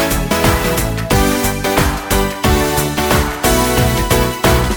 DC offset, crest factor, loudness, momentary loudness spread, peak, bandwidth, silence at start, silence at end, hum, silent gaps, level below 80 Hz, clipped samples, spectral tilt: under 0.1%; 14 dB; -14 LUFS; 3 LU; 0 dBFS; 19.5 kHz; 0 s; 0 s; none; none; -22 dBFS; under 0.1%; -4.5 dB/octave